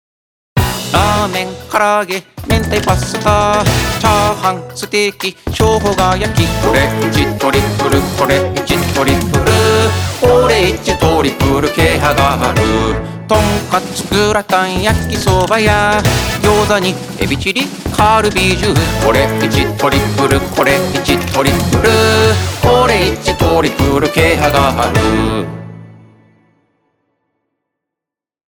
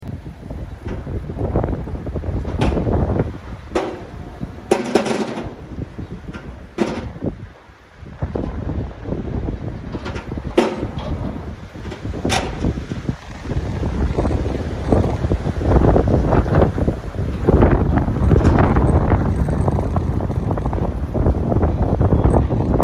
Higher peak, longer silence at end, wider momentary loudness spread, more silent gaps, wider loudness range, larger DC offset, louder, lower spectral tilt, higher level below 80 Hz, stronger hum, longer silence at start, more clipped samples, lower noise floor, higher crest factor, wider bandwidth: about the same, 0 dBFS vs -2 dBFS; first, 2.65 s vs 0 s; second, 6 LU vs 17 LU; neither; second, 2 LU vs 10 LU; neither; first, -12 LUFS vs -20 LUFS; second, -5 dB/octave vs -7.5 dB/octave; about the same, -28 dBFS vs -26 dBFS; neither; first, 0.55 s vs 0 s; neither; first, -86 dBFS vs -44 dBFS; second, 12 dB vs 18 dB; first, over 20 kHz vs 11.5 kHz